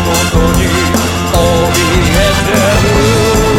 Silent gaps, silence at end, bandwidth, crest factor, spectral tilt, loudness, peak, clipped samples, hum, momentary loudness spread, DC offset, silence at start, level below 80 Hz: none; 0 s; 18 kHz; 10 dB; -4.5 dB/octave; -10 LUFS; 0 dBFS; under 0.1%; none; 2 LU; under 0.1%; 0 s; -18 dBFS